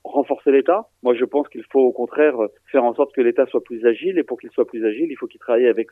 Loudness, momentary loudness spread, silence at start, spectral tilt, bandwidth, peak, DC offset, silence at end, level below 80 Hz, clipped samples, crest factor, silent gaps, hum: -19 LUFS; 7 LU; 0.05 s; -7.5 dB/octave; 3.7 kHz; -4 dBFS; under 0.1%; 0.05 s; -76 dBFS; under 0.1%; 16 dB; none; none